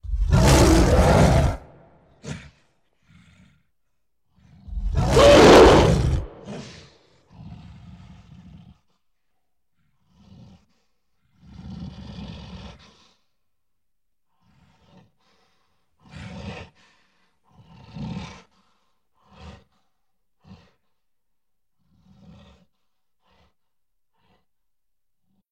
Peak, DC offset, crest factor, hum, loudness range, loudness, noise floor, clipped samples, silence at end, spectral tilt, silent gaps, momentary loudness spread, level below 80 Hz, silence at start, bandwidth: -4 dBFS; under 0.1%; 20 dB; none; 28 LU; -15 LUFS; -83 dBFS; under 0.1%; 7.25 s; -5.5 dB/octave; none; 30 LU; -32 dBFS; 0.05 s; 15.5 kHz